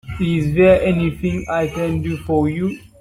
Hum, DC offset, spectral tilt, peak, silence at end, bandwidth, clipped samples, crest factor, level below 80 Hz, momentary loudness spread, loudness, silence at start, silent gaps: none; under 0.1%; -8 dB/octave; -2 dBFS; 0.2 s; 14 kHz; under 0.1%; 16 dB; -38 dBFS; 10 LU; -18 LUFS; 0.05 s; none